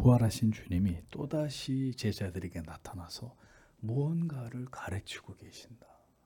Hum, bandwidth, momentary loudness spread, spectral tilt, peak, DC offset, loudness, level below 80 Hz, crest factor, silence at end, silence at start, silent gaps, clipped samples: none; 18 kHz; 17 LU; -7 dB/octave; -12 dBFS; under 0.1%; -35 LUFS; -54 dBFS; 20 dB; 0.5 s; 0 s; none; under 0.1%